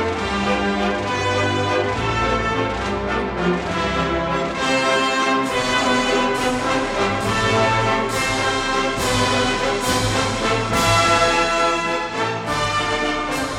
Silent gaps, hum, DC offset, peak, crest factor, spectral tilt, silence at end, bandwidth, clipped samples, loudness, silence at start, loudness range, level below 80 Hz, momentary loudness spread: none; none; under 0.1%; -4 dBFS; 16 dB; -4 dB/octave; 0 s; 17.5 kHz; under 0.1%; -19 LUFS; 0 s; 3 LU; -36 dBFS; 5 LU